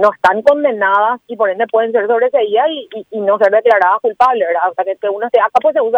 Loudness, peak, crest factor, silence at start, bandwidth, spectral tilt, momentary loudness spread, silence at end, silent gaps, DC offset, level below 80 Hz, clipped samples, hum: -13 LUFS; 0 dBFS; 12 dB; 0 s; 8 kHz; -5 dB/octave; 7 LU; 0 s; none; under 0.1%; -60 dBFS; under 0.1%; none